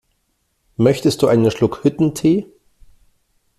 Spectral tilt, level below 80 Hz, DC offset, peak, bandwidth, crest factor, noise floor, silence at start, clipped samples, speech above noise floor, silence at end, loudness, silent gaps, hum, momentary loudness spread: -6.5 dB/octave; -50 dBFS; under 0.1%; -2 dBFS; 14.5 kHz; 16 dB; -67 dBFS; 0.8 s; under 0.1%; 52 dB; 1.15 s; -17 LUFS; none; none; 3 LU